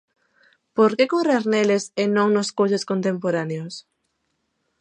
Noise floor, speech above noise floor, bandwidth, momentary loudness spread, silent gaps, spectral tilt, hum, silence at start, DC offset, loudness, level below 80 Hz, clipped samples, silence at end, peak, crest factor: -73 dBFS; 53 dB; 10 kHz; 11 LU; none; -5.5 dB/octave; none; 0.75 s; under 0.1%; -21 LUFS; -74 dBFS; under 0.1%; 1 s; -6 dBFS; 16 dB